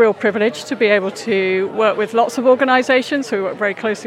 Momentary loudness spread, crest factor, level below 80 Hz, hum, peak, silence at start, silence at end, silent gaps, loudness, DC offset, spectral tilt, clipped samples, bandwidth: 6 LU; 14 dB; -84 dBFS; none; -2 dBFS; 0 s; 0 s; none; -16 LUFS; under 0.1%; -4.5 dB/octave; under 0.1%; 13.5 kHz